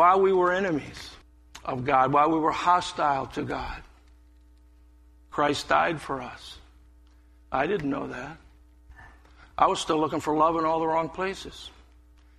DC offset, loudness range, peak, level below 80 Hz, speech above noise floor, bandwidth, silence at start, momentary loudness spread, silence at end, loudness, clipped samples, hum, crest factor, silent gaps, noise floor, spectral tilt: under 0.1%; 5 LU; -6 dBFS; -52 dBFS; 30 dB; 13 kHz; 0 s; 19 LU; 0.7 s; -25 LUFS; under 0.1%; none; 22 dB; none; -55 dBFS; -5 dB/octave